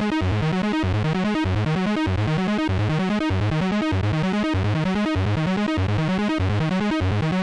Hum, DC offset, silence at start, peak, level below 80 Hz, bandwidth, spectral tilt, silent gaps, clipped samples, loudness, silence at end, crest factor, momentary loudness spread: none; under 0.1%; 0 s; -16 dBFS; -40 dBFS; 10.5 kHz; -7 dB/octave; none; under 0.1%; -22 LUFS; 0 s; 6 dB; 0 LU